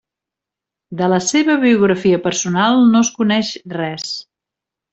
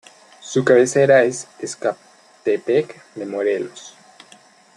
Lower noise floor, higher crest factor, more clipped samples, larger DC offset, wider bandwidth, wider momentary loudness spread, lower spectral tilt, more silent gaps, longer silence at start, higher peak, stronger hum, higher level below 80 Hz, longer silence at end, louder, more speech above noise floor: first, -85 dBFS vs -49 dBFS; about the same, 14 dB vs 18 dB; neither; neither; second, 8.2 kHz vs 11.5 kHz; second, 12 LU vs 19 LU; about the same, -4.5 dB/octave vs -5 dB/octave; neither; first, 0.9 s vs 0.45 s; about the same, -2 dBFS vs -2 dBFS; neither; first, -58 dBFS vs -68 dBFS; second, 0.7 s vs 0.85 s; first, -15 LUFS vs -18 LUFS; first, 70 dB vs 31 dB